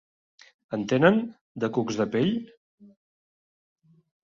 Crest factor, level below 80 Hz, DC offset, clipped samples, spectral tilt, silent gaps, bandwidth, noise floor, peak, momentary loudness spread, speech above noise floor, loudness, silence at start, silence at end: 22 dB; -66 dBFS; under 0.1%; under 0.1%; -6.5 dB/octave; 1.41-1.55 s; 7.4 kHz; under -90 dBFS; -6 dBFS; 13 LU; over 66 dB; -25 LUFS; 0.7 s; 1.8 s